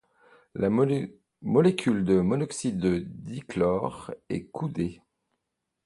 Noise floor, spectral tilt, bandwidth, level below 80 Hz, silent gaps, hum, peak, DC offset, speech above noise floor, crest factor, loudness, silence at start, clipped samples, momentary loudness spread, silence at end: -82 dBFS; -7 dB/octave; 11.5 kHz; -54 dBFS; none; none; -8 dBFS; under 0.1%; 56 dB; 20 dB; -27 LUFS; 0.55 s; under 0.1%; 15 LU; 0.9 s